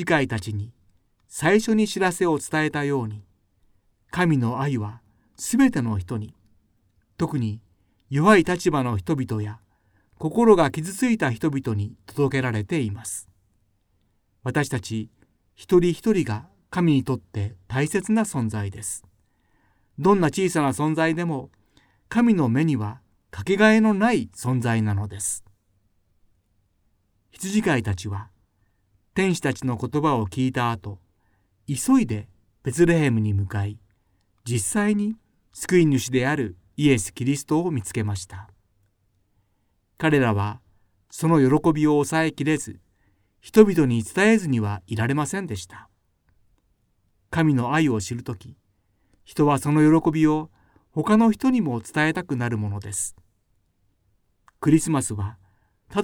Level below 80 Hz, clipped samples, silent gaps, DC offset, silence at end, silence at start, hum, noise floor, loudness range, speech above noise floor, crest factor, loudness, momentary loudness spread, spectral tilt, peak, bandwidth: -54 dBFS; under 0.1%; none; under 0.1%; 0 s; 0 s; none; -68 dBFS; 6 LU; 47 dB; 24 dB; -23 LUFS; 14 LU; -6 dB/octave; 0 dBFS; 19 kHz